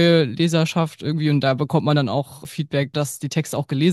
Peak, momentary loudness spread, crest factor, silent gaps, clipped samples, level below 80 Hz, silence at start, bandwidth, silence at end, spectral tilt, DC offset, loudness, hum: -4 dBFS; 6 LU; 16 dB; none; under 0.1%; -60 dBFS; 0 s; 12.5 kHz; 0 s; -6 dB/octave; under 0.1%; -21 LUFS; none